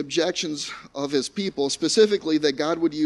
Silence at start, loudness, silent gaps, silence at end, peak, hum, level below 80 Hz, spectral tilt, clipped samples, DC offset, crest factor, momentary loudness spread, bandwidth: 0 s; -23 LUFS; none; 0 s; -4 dBFS; none; -64 dBFS; -3.5 dB/octave; under 0.1%; under 0.1%; 18 dB; 10 LU; 11.5 kHz